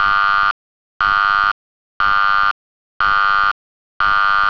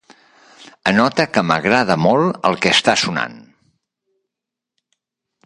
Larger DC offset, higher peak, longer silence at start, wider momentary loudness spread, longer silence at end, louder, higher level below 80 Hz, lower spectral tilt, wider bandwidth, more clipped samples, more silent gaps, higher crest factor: first, 0.3% vs under 0.1%; about the same, -4 dBFS vs -2 dBFS; second, 0 s vs 0.6 s; about the same, 9 LU vs 7 LU; second, 0 s vs 2.05 s; about the same, -15 LUFS vs -16 LUFS; first, -40 dBFS vs -56 dBFS; second, -2.5 dB/octave vs -4 dB/octave; second, 5.4 kHz vs 11 kHz; neither; first, 0.51-1.00 s, 1.52-2.00 s, 2.51-3.00 s, 3.51-4.00 s vs none; second, 12 dB vs 18 dB